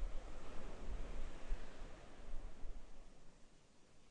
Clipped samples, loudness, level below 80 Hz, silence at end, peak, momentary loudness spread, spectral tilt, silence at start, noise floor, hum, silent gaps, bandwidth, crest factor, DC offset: under 0.1%; -55 LUFS; -48 dBFS; 0 s; -28 dBFS; 16 LU; -5.5 dB/octave; 0 s; -64 dBFS; none; none; 9 kHz; 16 dB; under 0.1%